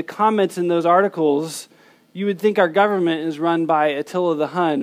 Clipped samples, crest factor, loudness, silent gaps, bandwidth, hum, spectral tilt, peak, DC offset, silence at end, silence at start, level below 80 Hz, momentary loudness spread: under 0.1%; 16 dB; -19 LUFS; none; 15.5 kHz; none; -5.5 dB/octave; -2 dBFS; under 0.1%; 0 s; 0 s; -78 dBFS; 8 LU